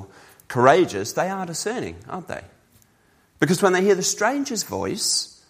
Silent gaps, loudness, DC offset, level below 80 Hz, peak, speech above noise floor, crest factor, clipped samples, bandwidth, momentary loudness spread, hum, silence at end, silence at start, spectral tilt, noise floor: none; -21 LUFS; under 0.1%; -60 dBFS; 0 dBFS; 39 dB; 22 dB; under 0.1%; 15.5 kHz; 16 LU; none; 0.2 s; 0 s; -3.5 dB/octave; -60 dBFS